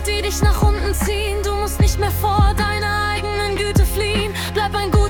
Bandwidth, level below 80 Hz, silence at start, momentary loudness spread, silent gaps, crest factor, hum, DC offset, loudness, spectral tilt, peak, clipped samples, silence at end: 18 kHz; -22 dBFS; 0 s; 4 LU; none; 12 dB; none; under 0.1%; -19 LUFS; -5 dB/octave; -4 dBFS; under 0.1%; 0 s